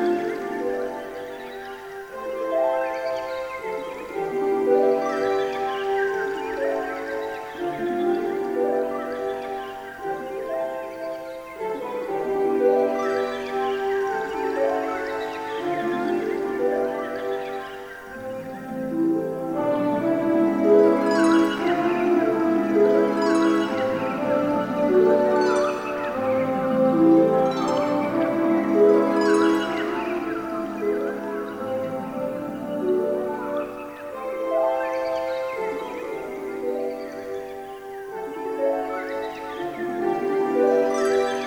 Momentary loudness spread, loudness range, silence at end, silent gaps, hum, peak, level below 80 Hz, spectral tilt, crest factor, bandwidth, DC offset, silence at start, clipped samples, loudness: 13 LU; 8 LU; 0 s; none; 50 Hz at -60 dBFS; -6 dBFS; -58 dBFS; -6 dB/octave; 18 dB; 16.5 kHz; under 0.1%; 0 s; under 0.1%; -24 LUFS